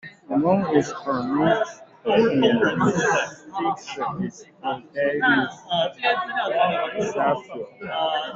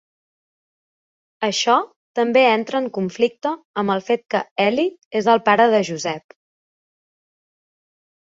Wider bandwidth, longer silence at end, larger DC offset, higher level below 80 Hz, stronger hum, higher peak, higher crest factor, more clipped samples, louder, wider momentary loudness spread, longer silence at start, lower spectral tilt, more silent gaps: about the same, 8 kHz vs 7.8 kHz; second, 0 s vs 2.1 s; neither; first, -62 dBFS vs -68 dBFS; neither; about the same, -4 dBFS vs -2 dBFS; about the same, 18 dB vs 18 dB; neither; second, -23 LUFS vs -19 LUFS; about the same, 11 LU vs 11 LU; second, 0.05 s vs 1.4 s; about the same, -5 dB/octave vs -4 dB/octave; second, none vs 1.96-2.14 s, 3.65-3.74 s, 4.51-4.56 s, 5.05-5.11 s